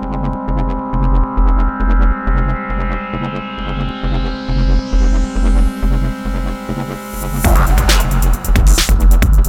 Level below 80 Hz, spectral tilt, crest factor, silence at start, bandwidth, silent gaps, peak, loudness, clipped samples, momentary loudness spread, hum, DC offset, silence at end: -14 dBFS; -5 dB/octave; 12 dB; 0 s; 16.5 kHz; none; 0 dBFS; -17 LUFS; under 0.1%; 10 LU; none; under 0.1%; 0 s